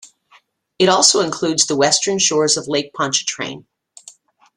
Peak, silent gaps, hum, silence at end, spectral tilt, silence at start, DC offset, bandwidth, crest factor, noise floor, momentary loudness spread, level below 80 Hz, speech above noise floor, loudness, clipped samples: 0 dBFS; none; none; 0.95 s; -2 dB/octave; 0.8 s; under 0.1%; 12 kHz; 18 dB; -54 dBFS; 12 LU; -60 dBFS; 37 dB; -15 LUFS; under 0.1%